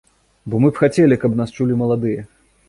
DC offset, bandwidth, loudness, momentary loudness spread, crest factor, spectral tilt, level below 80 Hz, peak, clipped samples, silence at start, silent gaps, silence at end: under 0.1%; 11.5 kHz; -17 LUFS; 10 LU; 16 dB; -8 dB/octave; -50 dBFS; -2 dBFS; under 0.1%; 0.45 s; none; 0.45 s